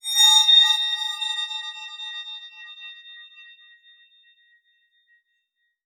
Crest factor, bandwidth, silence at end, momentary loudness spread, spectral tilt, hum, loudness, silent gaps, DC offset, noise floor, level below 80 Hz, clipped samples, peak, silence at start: 20 dB; 19 kHz; 2.45 s; 26 LU; 11.5 dB/octave; none; -16 LUFS; none; under 0.1%; -75 dBFS; under -90 dBFS; under 0.1%; -4 dBFS; 0.05 s